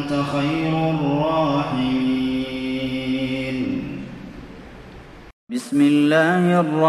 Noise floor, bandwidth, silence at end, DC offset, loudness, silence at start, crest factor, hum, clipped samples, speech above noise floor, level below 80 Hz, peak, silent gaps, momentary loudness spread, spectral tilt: -41 dBFS; 12.5 kHz; 0 s; under 0.1%; -20 LUFS; 0 s; 16 dB; none; under 0.1%; 22 dB; -46 dBFS; -4 dBFS; 5.33-5.47 s; 21 LU; -7 dB/octave